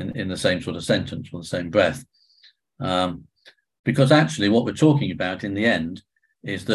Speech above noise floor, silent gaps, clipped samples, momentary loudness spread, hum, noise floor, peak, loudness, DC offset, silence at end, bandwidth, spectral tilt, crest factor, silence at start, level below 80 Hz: 36 dB; 3.79-3.84 s; under 0.1%; 15 LU; none; -57 dBFS; -2 dBFS; -22 LUFS; under 0.1%; 0 s; 12.5 kHz; -6 dB/octave; 20 dB; 0 s; -50 dBFS